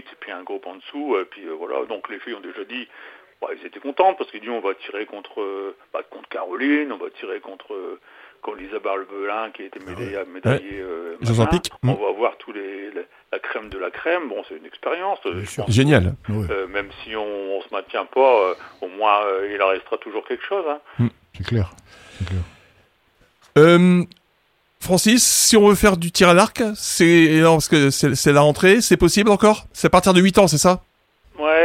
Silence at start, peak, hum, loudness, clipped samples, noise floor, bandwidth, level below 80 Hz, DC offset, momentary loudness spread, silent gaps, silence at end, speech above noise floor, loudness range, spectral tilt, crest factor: 0.2 s; 0 dBFS; none; -18 LUFS; under 0.1%; -63 dBFS; 16.5 kHz; -44 dBFS; under 0.1%; 19 LU; none; 0 s; 44 dB; 13 LU; -4.5 dB/octave; 20 dB